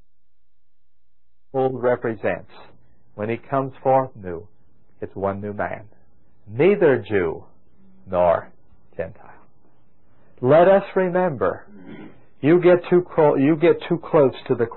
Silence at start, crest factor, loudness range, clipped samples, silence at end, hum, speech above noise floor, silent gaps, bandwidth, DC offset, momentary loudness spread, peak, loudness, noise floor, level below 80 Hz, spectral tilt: 1.55 s; 16 dB; 8 LU; under 0.1%; 0 s; none; 56 dB; none; 4.2 kHz; 0.8%; 18 LU; -6 dBFS; -20 LUFS; -75 dBFS; -54 dBFS; -12 dB/octave